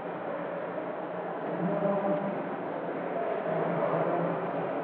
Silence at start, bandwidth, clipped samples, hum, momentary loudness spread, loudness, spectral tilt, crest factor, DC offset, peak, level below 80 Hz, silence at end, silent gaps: 0 s; 4.5 kHz; under 0.1%; none; 7 LU; -32 LUFS; -6.5 dB/octave; 16 dB; under 0.1%; -16 dBFS; -82 dBFS; 0 s; none